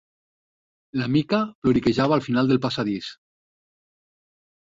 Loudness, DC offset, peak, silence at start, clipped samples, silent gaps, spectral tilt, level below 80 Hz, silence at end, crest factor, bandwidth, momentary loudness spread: -23 LUFS; under 0.1%; -8 dBFS; 0.95 s; under 0.1%; 1.55-1.62 s; -7 dB/octave; -54 dBFS; 1.65 s; 18 dB; 7.8 kHz; 10 LU